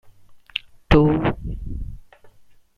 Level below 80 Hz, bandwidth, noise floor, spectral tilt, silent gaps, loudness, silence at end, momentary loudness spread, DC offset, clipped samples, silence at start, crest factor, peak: -32 dBFS; 6.6 kHz; -49 dBFS; -8.5 dB/octave; none; -21 LUFS; 0.5 s; 18 LU; under 0.1%; under 0.1%; 0.05 s; 22 dB; -2 dBFS